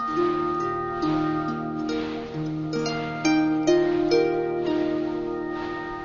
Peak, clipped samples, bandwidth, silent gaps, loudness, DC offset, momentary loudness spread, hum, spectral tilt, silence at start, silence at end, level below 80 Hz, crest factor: -8 dBFS; under 0.1%; 7.4 kHz; none; -25 LUFS; under 0.1%; 9 LU; none; -6 dB/octave; 0 s; 0 s; -52 dBFS; 16 dB